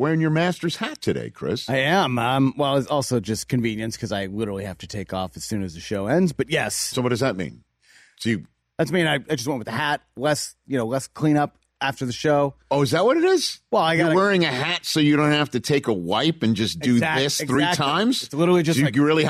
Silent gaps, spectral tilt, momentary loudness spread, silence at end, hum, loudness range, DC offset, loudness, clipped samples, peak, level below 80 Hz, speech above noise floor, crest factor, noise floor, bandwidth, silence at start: none; -5 dB/octave; 10 LU; 0 s; none; 6 LU; under 0.1%; -22 LUFS; under 0.1%; -10 dBFS; -56 dBFS; 34 dB; 12 dB; -56 dBFS; 15 kHz; 0 s